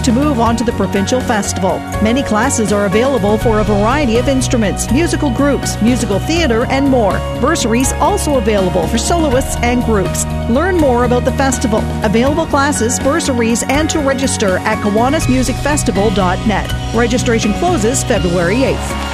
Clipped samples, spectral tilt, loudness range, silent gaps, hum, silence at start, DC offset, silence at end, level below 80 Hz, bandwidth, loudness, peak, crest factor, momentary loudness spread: under 0.1%; -5 dB/octave; 1 LU; none; none; 0 s; under 0.1%; 0 s; -24 dBFS; 13.5 kHz; -13 LUFS; 0 dBFS; 12 dB; 3 LU